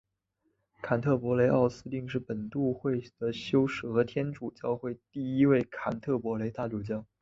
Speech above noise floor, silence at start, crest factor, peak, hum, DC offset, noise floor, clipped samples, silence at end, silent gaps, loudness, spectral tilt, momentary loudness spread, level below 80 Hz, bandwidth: 48 dB; 0.85 s; 18 dB; -12 dBFS; none; under 0.1%; -78 dBFS; under 0.1%; 0.2 s; none; -30 LUFS; -8 dB/octave; 11 LU; -62 dBFS; 7.6 kHz